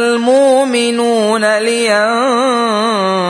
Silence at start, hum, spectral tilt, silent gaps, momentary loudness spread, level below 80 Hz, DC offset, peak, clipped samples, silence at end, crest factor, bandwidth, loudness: 0 s; none; -3.5 dB/octave; none; 3 LU; -64 dBFS; under 0.1%; 0 dBFS; under 0.1%; 0 s; 12 dB; 11 kHz; -12 LUFS